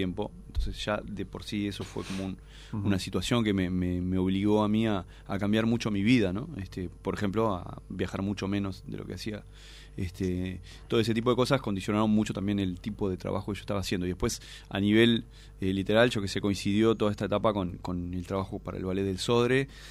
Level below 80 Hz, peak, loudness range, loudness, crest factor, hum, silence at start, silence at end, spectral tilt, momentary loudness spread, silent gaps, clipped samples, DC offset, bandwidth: -46 dBFS; -8 dBFS; 6 LU; -29 LUFS; 20 dB; none; 0 s; 0 s; -6 dB/octave; 13 LU; none; under 0.1%; under 0.1%; 14 kHz